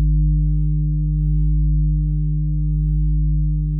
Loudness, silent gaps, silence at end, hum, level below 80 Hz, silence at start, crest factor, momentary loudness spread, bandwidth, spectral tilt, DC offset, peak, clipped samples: -20 LUFS; none; 0 s; none; -18 dBFS; 0 s; 6 dB; 2 LU; 0.5 kHz; -18 dB/octave; under 0.1%; -10 dBFS; under 0.1%